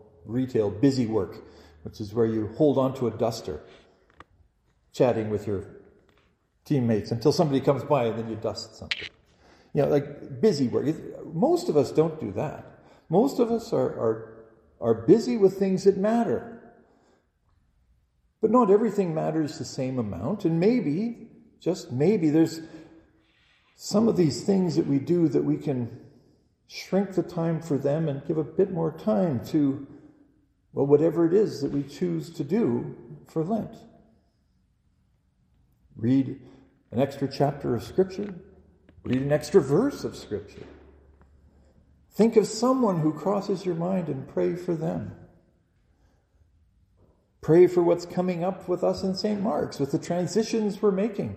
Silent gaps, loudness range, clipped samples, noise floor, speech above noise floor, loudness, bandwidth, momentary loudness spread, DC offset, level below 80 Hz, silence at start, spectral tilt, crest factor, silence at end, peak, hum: none; 6 LU; under 0.1%; -67 dBFS; 43 dB; -25 LUFS; 15 kHz; 14 LU; under 0.1%; -60 dBFS; 0.25 s; -7 dB/octave; 20 dB; 0 s; -6 dBFS; none